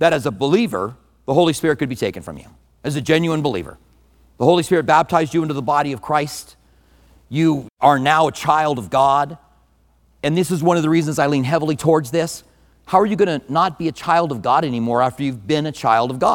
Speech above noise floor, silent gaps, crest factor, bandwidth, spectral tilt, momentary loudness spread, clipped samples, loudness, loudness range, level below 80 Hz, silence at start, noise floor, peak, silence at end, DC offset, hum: 39 dB; 7.70-7.77 s; 18 dB; 18.5 kHz; -5.5 dB/octave; 11 LU; under 0.1%; -18 LUFS; 2 LU; -52 dBFS; 0 s; -57 dBFS; 0 dBFS; 0 s; under 0.1%; none